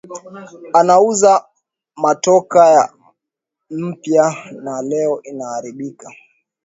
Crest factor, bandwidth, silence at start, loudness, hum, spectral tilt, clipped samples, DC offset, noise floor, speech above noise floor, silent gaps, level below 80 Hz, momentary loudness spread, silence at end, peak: 16 dB; 8 kHz; 0.1 s; -14 LUFS; none; -4.5 dB/octave; under 0.1%; under 0.1%; -81 dBFS; 67 dB; none; -66 dBFS; 19 LU; 0.55 s; 0 dBFS